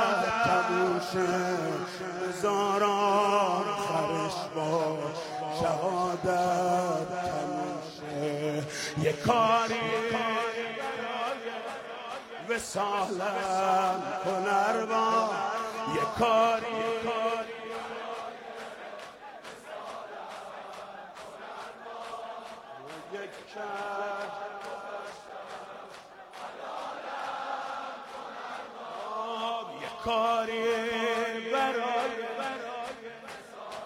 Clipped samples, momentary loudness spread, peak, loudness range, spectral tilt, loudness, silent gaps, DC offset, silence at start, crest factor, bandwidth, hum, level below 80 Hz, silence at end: under 0.1%; 17 LU; -12 dBFS; 13 LU; -4.5 dB/octave; -30 LUFS; none; under 0.1%; 0 s; 20 dB; 16 kHz; none; -66 dBFS; 0 s